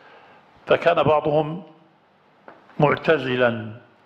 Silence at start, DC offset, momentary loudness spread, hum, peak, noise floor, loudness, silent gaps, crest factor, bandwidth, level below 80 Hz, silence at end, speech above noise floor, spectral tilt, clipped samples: 0.65 s; under 0.1%; 19 LU; none; -4 dBFS; -57 dBFS; -20 LUFS; none; 20 dB; 7.6 kHz; -58 dBFS; 0.25 s; 38 dB; -7.5 dB/octave; under 0.1%